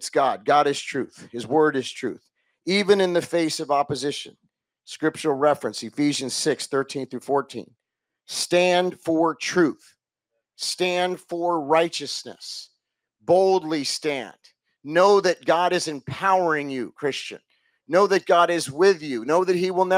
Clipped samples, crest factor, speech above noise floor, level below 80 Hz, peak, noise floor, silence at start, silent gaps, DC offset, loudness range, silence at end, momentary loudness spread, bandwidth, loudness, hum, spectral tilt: under 0.1%; 18 dB; 59 dB; -74 dBFS; -4 dBFS; -81 dBFS; 0 s; none; under 0.1%; 3 LU; 0 s; 15 LU; 16 kHz; -22 LUFS; none; -4 dB/octave